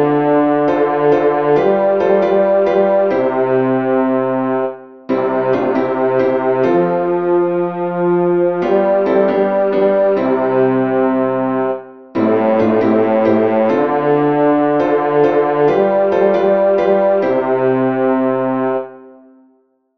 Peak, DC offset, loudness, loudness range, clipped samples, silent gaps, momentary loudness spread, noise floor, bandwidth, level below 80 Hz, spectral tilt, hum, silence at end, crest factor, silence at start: 0 dBFS; 0.3%; -14 LUFS; 3 LU; under 0.1%; none; 4 LU; -56 dBFS; 6.2 kHz; -60 dBFS; -9 dB/octave; none; 0.85 s; 12 dB; 0 s